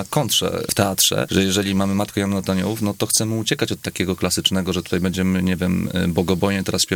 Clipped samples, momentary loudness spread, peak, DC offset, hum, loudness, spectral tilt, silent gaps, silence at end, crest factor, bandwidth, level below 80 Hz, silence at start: under 0.1%; 5 LU; 0 dBFS; under 0.1%; none; -20 LUFS; -4 dB/octave; none; 0 s; 20 dB; 19 kHz; -48 dBFS; 0 s